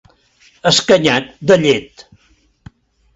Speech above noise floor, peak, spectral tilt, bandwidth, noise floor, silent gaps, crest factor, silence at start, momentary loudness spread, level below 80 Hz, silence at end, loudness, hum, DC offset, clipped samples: 38 dB; 0 dBFS; -4 dB/octave; 8.2 kHz; -52 dBFS; none; 16 dB; 0.65 s; 8 LU; -50 dBFS; 1.3 s; -13 LUFS; none; under 0.1%; under 0.1%